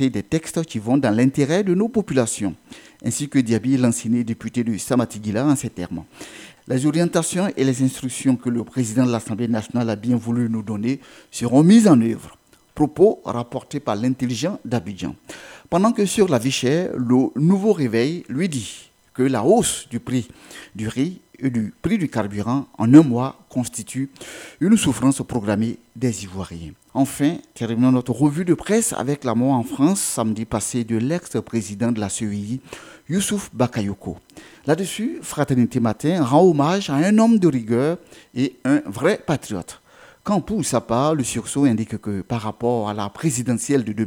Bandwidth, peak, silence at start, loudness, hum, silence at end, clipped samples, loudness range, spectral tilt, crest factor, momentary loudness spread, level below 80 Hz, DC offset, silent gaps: 16.5 kHz; 0 dBFS; 0 s; -20 LUFS; none; 0 s; under 0.1%; 5 LU; -6 dB/octave; 20 dB; 13 LU; -52 dBFS; under 0.1%; none